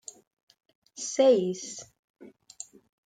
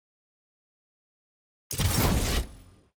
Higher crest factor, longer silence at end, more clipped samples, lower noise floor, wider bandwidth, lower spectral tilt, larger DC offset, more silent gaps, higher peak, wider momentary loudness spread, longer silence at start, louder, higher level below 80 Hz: about the same, 20 dB vs 20 dB; first, 0.8 s vs 0.35 s; neither; about the same, -49 dBFS vs -50 dBFS; second, 9.4 kHz vs over 20 kHz; about the same, -4 dB/octave vs -4 dB/octave; neither; first, 1.99-2.14 s vs none; about the same, -10 dBFS vs -12 dBFS; first, 23 LU vs 12 LU; second, 1 s vs 1.7 s; about the same, -26 LUFS vs -27 LUFS; second, -80 dBFS vs -36 dBFS